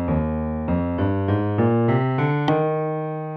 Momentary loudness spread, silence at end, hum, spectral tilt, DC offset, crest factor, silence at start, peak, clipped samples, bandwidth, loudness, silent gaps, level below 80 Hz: 6 LU; 0 s; none; -10 dB/octave; under 0.1%; 14 dB; 0 s; -8 dBFS; under 0.1%; 6 kHz; -22 LUFS; none; -38 dBFS